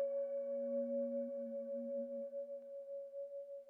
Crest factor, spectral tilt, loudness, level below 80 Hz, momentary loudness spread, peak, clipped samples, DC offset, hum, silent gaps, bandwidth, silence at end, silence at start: 10 dB; -9 dB/octave; -43 LUFS; under -90 dBFS; 9 LU; -32 dBFS; under 0.1%; under 0.1%; none; none; 2.4 kHz; 0 s; 0 s